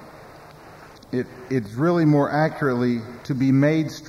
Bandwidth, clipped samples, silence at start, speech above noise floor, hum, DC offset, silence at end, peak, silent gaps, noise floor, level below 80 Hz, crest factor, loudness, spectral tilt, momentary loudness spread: 13.5 kHz; under 0.1%; 0 s; 24 dB; none; under 0.1%; 0 s; -8 dBFS; none; -44 dBFS; -58 dBFS; 14 dB; -22 LUFS; -8 dB/octave; 11 LU